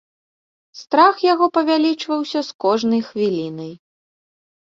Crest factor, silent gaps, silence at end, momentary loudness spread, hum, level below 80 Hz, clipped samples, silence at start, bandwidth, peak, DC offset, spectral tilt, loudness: 18 dB; 2.55-2.59 s; 1 s; 11 LU; none; -66 dBFS; under 0.1%; 0.75 s; 7.6 kHz; -2 dBFS; under 0.1%; -5.5 dB/octave; -18 LUFS